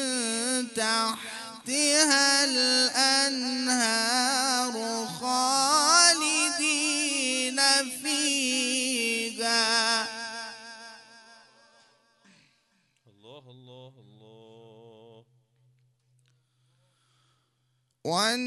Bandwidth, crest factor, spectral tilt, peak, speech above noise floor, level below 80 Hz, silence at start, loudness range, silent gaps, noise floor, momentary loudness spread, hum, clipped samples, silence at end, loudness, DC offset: 12 kHz; 24 dB; 0 dB/octave; -4 dBFS; 49 dB; -84 dBFS; 0 s; 8 LU; none; -73 dBFS; 13 LU; none; under 0.1%; 0 s; -23 LUFS; under 0.1%